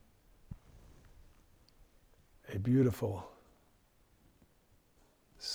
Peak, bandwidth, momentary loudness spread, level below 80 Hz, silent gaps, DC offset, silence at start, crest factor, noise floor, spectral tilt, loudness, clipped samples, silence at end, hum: -20 dBFS; 17.5 kHz; 25 LU; -62 dBFS; none; under 0.1%; 0.5 s; 20 dB; -69 dBFS; -7 dB/octave; -34 LUFS; under 0.1%; 0 s; none